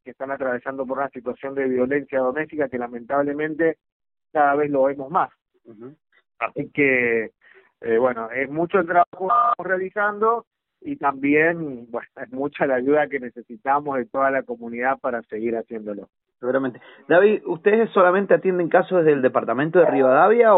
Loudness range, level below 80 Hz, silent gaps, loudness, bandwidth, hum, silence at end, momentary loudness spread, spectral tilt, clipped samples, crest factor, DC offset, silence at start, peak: 6 LU; -66 dBFS; 3.92-4.00 s, 9.07-9.12 s, 10.47-10.51 s; -21 LUFS; 4 kHz; none; 0 s; 14 LU; -5 dB/octave; under 0.1%; 18 dB; under 0.1%; 0.05 s; -4 dBFS